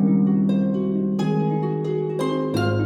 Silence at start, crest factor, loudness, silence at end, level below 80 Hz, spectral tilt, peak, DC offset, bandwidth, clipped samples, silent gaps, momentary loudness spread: 0 s; 12 dB; -22 LUFS; 0 s; -56 dBFS; -8.5 dB/octave; -8 dBFS; under 0.1%; 10.5 kHz; under 0.1%; none; 5 LU